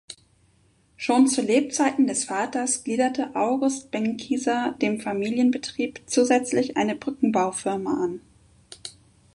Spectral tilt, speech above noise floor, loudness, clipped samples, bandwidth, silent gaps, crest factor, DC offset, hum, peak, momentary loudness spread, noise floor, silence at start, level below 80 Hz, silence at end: -3.5 dB/octave; 38 dB; -24 LUFS; under 0.1%; 11.5 kHz; none; 18 dB; under 0.1%; none; -8 dBFS; 10 LU; -62 dBFS; 0.1 s; -64 dBFS; 0.45 s